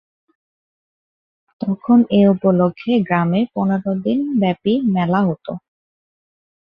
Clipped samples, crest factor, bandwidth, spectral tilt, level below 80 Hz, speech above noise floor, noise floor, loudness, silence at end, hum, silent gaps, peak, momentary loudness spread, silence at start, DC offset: under 0.1%; 16 dB; 5.2 kHz; -10.5 dB/octave; -58 dBFS; over 74 dB; under -90 dBFS; -17 LUFS; 1.1 s; none; none; -2 dBFS; 11 LU; 1.6 s; under 0.1%